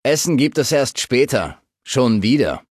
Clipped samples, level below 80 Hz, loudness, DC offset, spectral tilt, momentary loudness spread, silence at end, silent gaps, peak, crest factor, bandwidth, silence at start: under 0.1%; -46 dBFS; -17 LUFS; under 0.1%; -4.5 dB/octave; 6 LU; 0.1 s; none; -4 dBFS; 14 dB; 15 kHz; 0.05 s